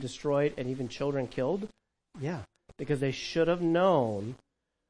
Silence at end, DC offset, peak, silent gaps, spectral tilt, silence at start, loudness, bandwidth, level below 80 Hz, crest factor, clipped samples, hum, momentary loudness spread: 0.55 s; under 0.1%; -12 dBFS; none; -6.5 dB/octave; 0 s; -30 LUFS; 10.5 kHz; -60 dBFS; 18 dB; under 0.1%; none; 15 LU